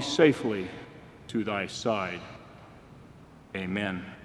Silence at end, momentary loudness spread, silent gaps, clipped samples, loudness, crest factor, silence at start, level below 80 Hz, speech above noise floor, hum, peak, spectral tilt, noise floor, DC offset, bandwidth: 0 s; 27 LU; none; under 0.1%; -30 LUFS; 24 dB; 0 s; -62 dBFS; 23 dB; none; -8 dBFS; -5 dB/octave; -51 dBFS; under 0.1%; 12 kHz